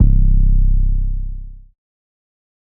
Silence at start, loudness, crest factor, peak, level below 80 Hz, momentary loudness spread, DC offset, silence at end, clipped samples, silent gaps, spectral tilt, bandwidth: 0 s; -19 LUFS; 14 dB; 0 dBFS; -16 dBFS; 15 LU; under 0.1%; 1.15 s; under 0.1%; none; -17 dB/octave; 0.5 kHz